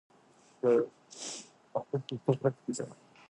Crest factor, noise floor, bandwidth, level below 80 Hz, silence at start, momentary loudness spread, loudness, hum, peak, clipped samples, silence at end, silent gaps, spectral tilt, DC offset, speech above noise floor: 20 dB; -63 dBFS; 11.5 kHz; -78 dBFS; 0.65 s; 14 LU; -33 LUFS; none; -14 dBFS; under 0.1%; 0.35 s; none; -6 dB/octave; under 0.1%; 31 dB